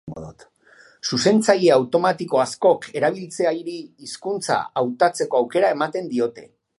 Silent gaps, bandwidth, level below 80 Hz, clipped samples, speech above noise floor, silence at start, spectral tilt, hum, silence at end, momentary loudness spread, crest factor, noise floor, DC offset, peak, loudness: none; 11.5 kHz; -62 dBFS; under 0.1%; 32 dB; 0.05 s; -4.5 dB/octave; none; 0.35 s; 15 LU; 20 dB; -52 dBFS; under 0.1%; -2 dBFS; -20 LUFS